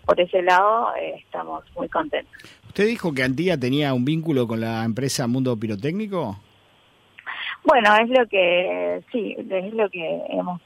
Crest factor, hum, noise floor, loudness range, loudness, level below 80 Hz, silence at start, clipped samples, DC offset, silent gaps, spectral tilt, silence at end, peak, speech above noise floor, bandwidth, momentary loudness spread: 18 dB; none; -57 dBFS; 4 LU; -22 LUFS; -58 dBFS; 0.05 s; under 0.1%; under 0.1%; none; -5.5 dB/octave; 0.1 s; -4 dBFS; 35 dB; 16 kHz; 14 LU